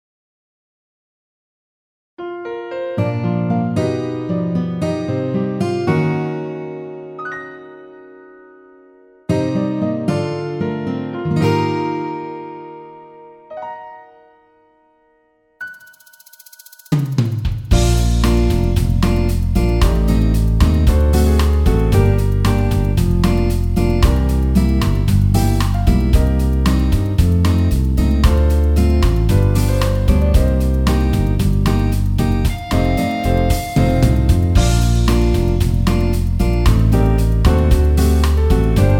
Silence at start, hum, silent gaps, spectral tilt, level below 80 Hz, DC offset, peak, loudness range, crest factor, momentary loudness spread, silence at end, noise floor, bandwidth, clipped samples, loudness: 2.2 s; none; none; -7 dB/octave; -18 dBFS; under 0.1%; 0 dBFS; 11 LU; 16 dB; 13 LU; 0 s; -58 dBFS; 17 kHz; under 0.1%; -16 LUFS